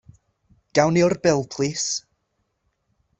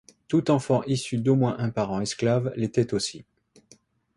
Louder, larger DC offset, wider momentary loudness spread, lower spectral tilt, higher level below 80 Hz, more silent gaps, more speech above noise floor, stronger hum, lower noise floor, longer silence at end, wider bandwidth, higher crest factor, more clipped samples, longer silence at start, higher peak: first, -21 LUFS vs -25 LUFS; neither; about the same, 7 LU vs 5 LU; second, -4.5 dB/octave vs -6 dB/octave; about the same, -58 dBFS vs -58 dBFS; neither; first, 53 dB vs 35 dB; neither; first, -73 dBFS vs -59 dBFS; first, 1.2 s vs 0.95 s; second, 8.4 kHz vs 11.5 kHz; about the same, 20 dB vs 18 dB; neither; first, 0.75 s vs 0.3 s; first, -4 dBFS vs -8 dBFS